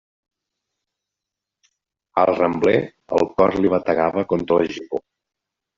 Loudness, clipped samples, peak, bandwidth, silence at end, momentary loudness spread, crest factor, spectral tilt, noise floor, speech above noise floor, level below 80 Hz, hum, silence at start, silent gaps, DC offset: -20 LUFS; under 0.1%; -2 dBFS; 7.6 kHz; 0.8 s; 9 LU; 18 dB; -5.5 dB/octave; -85 dBFS; 66 dB; -54 dBFS; none; 2.15 s; none; under 0.1%